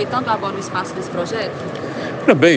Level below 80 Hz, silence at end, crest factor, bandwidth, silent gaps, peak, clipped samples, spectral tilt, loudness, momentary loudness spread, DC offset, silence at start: -62 dBFS; 0 s; 18 dB; 9.6 kHz; none; 0 dBFS; under 0.1%; -5.5 dB/octave; -21 LUFS; 9 LU; under 0.1%; 0 s